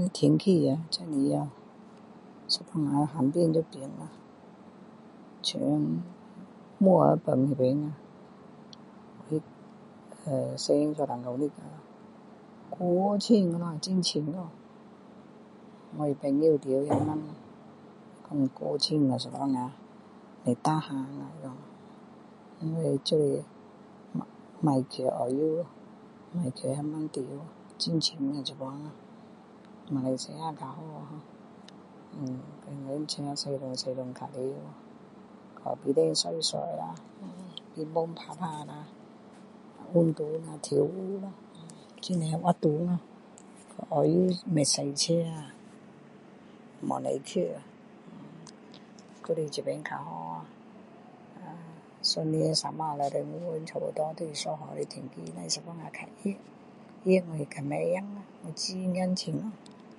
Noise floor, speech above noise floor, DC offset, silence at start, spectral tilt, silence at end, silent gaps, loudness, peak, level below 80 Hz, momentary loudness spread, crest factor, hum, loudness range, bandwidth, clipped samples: -52 dBFS; 23 dB; under 0.1%; 0 s; -5.5 dB/octave; 0.05 s; none; -30 LUFS; -8 dBFS; -72 dBFS; 25 LU; 24 dB; none; 9 LU; 11.5 kHz; under 0.1%